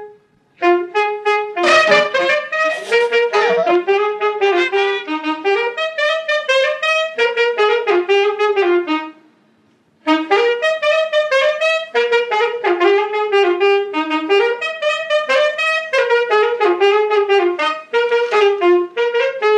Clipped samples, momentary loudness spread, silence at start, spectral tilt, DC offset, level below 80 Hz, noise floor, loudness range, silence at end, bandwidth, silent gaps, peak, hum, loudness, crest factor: under 0.1%; 5 LU; 0 s; -2.5 dB/octave; under 0.1%; -76 dBFS; -56 dBFS; 2 LU; 0 s; 10.5 kHz; none; 0 dBFS; none; -15 LUFS; 16 dB